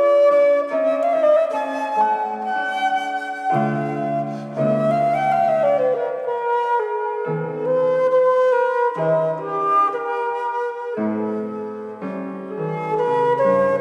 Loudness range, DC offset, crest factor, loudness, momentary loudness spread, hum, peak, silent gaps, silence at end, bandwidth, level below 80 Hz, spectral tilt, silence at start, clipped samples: 4 LU; under 0.1%; 14 dB; -20 LUFS; 9 LU; none; -6 dBFS; none; 0 s; 11.5 kHz; -80 dBFS; -7 dB/octave; 0 s; under 0.1%